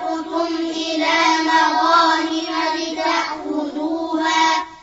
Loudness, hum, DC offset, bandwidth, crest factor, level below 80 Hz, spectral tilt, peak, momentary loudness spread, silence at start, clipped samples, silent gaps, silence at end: -18 LUFS; none; under 0.1%; 8 kHz; 16 dB; -60 dBFS; -1.5 dB/octave; -4 dBFS; 9 LU; 0 s; under 0.1%; none; 0.05 s